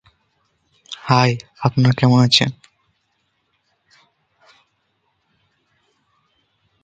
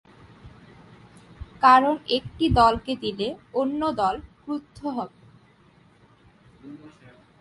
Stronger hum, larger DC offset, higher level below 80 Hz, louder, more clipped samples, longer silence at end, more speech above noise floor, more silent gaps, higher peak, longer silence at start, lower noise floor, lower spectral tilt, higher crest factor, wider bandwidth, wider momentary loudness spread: neither; neither; second, -56 dBFS vs -44 dBFS; first, -16 LUFS vs -23 LUFS; neither; first, 4.3 s vs 0.55 s; first, 53 dB vs 34 dB; neither; first, 0 dBFS vs -4 dBFS; first, 0.9 s vs 0.45 s; first, -68 dBFS vs -57 dBFS; about the same, -5.5 dB/octave vs -6 dB/octave; about the same, 22 dB vs 22 dB; second, 9 kHz vs 11.5 kHz; second, 13 LU vs 27 LU